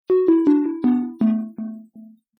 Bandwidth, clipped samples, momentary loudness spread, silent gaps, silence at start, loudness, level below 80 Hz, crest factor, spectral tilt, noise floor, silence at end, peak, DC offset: 4.3 kHz; under 0.1%; 17 LU; none; 0.1 s; -19 LUFS; -66 dBFS; 14 dB; -10.5 dB/octave; -46 dBFS; 0.3 s; -6 dBFS; under 0.1%